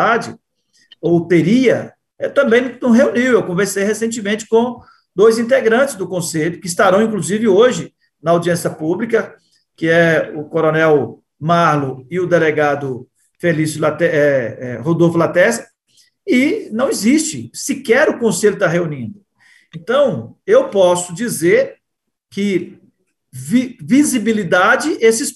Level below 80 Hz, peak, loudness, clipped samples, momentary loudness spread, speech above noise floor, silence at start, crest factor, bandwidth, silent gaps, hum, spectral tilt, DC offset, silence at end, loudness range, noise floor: -60 dBFS; -2 dBFS; -15 LUFS; under 0.1%; 12 LU; 62 dB; 0 s; 14 dB; 13 kHz; none; none; -5 dB/octave; under 0.1%; 0 s; 2 LU; -76 dBFS